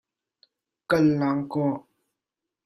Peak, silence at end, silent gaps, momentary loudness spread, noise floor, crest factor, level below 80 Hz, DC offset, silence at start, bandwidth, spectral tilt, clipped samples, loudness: -10 dBFS; 0.85 s; none; 7 LU; -87 dBFS; 18 dB; -62 dBFS; under 0.1%; 0.9 s; 13 kHz; -8 dB/octave; under 0.1%; -24 LUFS